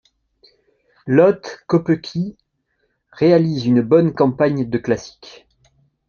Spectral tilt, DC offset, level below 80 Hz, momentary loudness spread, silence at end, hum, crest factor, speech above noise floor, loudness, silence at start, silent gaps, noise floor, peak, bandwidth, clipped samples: -8 dB/octave; under 0.1%; -56 dBFS; 12 LU; 1 s; none; 18 dB; 52 dB; -17 LUFS; 1.05 s; none; -69 dBFS; 0 dBFS; 7 kHz; under 0.1%